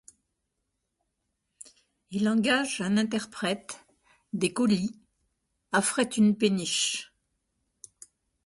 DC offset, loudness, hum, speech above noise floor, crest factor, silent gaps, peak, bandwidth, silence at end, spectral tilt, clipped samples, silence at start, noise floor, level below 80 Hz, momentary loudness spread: under 0.1%; -27 LUFS; none; 54 dB; 18 dB; none; -12 dBFS; 11.5 kHz; 1.4 s; -4 dB/octave; under 0.1%; 2.1 s; -81 dBFS; -70 dBFS; 12 LU